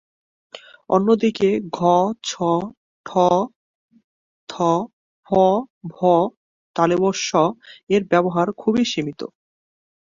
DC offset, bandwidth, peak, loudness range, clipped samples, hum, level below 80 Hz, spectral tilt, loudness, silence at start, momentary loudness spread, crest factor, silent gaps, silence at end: under 0.1%; 7.6 kHz; -2 dBFS; 2 LU; under 0.1%; none; -60 dBFS; -5.5 dB/octave; -20 LUFS; 0.55 s; 17 LU; 18 dB; 2.77-3.04 s, 3.56-3.89 s, 4.04-4.47 s, 4.93-5.23 s, 5.70-5.81 s, 6.37-6.74 s, 7.83-7.87 s; 0.85 s